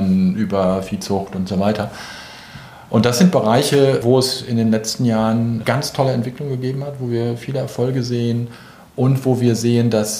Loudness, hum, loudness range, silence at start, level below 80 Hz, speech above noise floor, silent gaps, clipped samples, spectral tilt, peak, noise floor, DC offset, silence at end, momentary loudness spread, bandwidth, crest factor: -18 LUFS; none; 5 LU; 0 s; -52 dBFS; 20 dB; none; under 0.1%; -6 dB/octave; -2 dBFS; -38 dBFS; under 0.1%; 0 s; 12 LU; 15.5 kHz; 16 dB